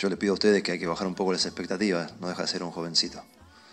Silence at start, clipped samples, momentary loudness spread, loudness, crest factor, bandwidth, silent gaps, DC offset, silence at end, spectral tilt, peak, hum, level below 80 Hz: 0 s; under 0.1%; 9 LU; -27 LUFS; 20 dB; 11 kHz; none; under 0.1%; 0.3 s; -4 dB/octave; -8 dBFS; none; -62 dBFS